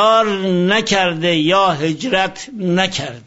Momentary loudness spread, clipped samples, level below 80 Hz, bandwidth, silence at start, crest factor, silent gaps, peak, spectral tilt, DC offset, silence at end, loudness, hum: 6 LU; under 0.1%; -52 dBFS; 8 kHz; 0 s; 14 dB; none; -2 dBFS; -4.5 dB/octave; under 0.1%; 0.05 s; -16 LUFS; none